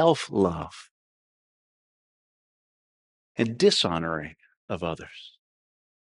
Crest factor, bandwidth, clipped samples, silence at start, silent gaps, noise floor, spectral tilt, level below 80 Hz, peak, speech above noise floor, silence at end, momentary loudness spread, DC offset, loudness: 22 dB; 11 kHz; under 0.1%; 0 s; 0.91-3.35 s, 4.57-4.68 s; under -90 dBFS; -5 dB/octave; -58 dBFS; -6 dBFS; over 65 dB; 0.75 s; 21 LU; under 0.1%; -26 LUFS